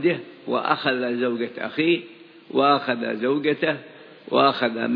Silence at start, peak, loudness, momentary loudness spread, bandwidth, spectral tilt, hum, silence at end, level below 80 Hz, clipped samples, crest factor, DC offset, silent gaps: 0 s; -4 dBFS; -23 LUFS; 8 LU; 5.2 kHz; -8 dB/octave; none; 0 s; -76 dBFS; under 0.1%; 18 dB; under 0.1%; none